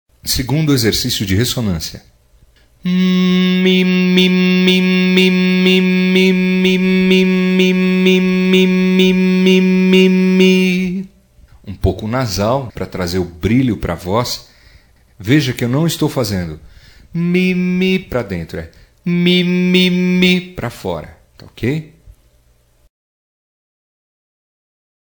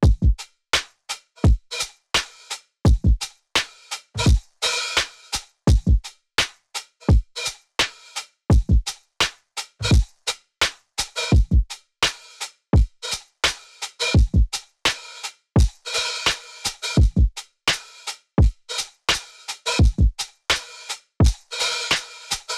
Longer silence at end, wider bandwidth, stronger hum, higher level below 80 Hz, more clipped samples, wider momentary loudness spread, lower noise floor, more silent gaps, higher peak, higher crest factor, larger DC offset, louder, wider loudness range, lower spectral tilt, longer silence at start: first, 3.05 s vs 0 s; first, 19.5 kHz vs 14 kHz; neither; second, -38 dBFS vs -24 dBFS; neither; about the same, 13 LU vs 13 LU; first, -53 dBFS vs -38 dBFS; neither; first, 0 dBFS vs -4 dBFS; about the same, 14 dB vs 16 dB; neither; first, -14 LUFS vs -22 LUFS; first, 7 LU vs 1 LU; first, -5.5 dB/octave vs -4 dB/octave; first, 0.25 s vs 0 s